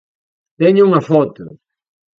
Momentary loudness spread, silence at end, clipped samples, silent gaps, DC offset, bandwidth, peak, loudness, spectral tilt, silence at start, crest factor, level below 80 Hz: 6 LU; 0.7 s; under 0.1%; none; under 0.1%; 6.4 kHz; 0 dBFS; -13 LUFS; -9 dB/octave; 0.6 s; 16 dB; -62 dBFS